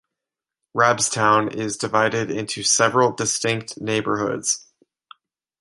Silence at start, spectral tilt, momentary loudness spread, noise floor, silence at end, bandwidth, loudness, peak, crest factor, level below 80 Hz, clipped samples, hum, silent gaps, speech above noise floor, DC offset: 0.75 s; -3 dB/octave; 9 LU; -87 dBFS; 1 s; 11.5 kHz; -20 LUFS; -2 dBFS; 20 dB; -62 dBFS; under 0.1%; none; none; 66 dB; under 0.1%